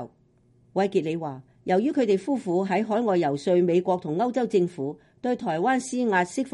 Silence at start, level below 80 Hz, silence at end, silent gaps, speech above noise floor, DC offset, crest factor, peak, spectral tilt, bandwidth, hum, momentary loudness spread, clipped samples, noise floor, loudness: 0 s; -70 dBFS; 0.05 s; none; 37 dB; under 0.1%; 14 dB; -10 dBFS; -6.5 dB/octave; 11.5 kHz; none; 10 LU; under 0.1%; -61 dBFS; -25 LUFS